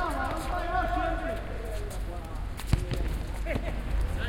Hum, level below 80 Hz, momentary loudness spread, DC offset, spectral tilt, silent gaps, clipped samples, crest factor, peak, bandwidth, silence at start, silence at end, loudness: none; -32 dBFS; 8 LU; under 0.1%; -6 dB/octave; none; under 0.1%; 20 dB; -10 dBFS; 16.5 kHz; 0 s; 0 s; -33 LUFS